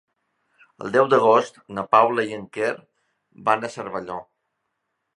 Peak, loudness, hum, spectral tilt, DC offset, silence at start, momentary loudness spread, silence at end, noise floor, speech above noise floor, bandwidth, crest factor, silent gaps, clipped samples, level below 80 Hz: -2 dBFS; -21 LUFS; none; -5.5 dB/octave; under 0.1%; 0.8 s; 17 LU; 0.95 s; -77 dBFS; 56 dB; 11 kHz; 22 dB; none; under 0.1%; -68 dBFS